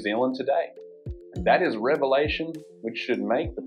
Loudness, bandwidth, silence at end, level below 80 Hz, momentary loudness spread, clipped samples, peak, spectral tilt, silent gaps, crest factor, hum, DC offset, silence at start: -25 LUFS; 10 kHz; 0 s; -46 dBFS; 15 LU; under 0.1%; -8 dBFS; -7 dB/octave; none; 18 dB; none; under 0.1%; 0 s